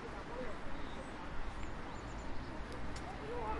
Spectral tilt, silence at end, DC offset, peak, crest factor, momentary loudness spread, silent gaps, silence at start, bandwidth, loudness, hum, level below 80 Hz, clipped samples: -5.5 dB/octave; 0 s; under 0.1%; -28 dBFS; 12 dB; 2 LU; none; 0 s; 11.5 kHz; -46 LUFS; none; -48 dBFS; under 0.1%